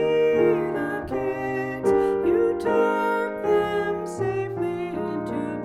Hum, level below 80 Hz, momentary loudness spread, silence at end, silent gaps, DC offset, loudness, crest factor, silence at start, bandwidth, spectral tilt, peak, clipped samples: none; -52 dBFS; 7 LU; 0 s; none; under 0.1%; -24 LUFS; 14 dB; 0 s; 13 kHz; -7 dB/octave; -10 dBFS; under 0.1%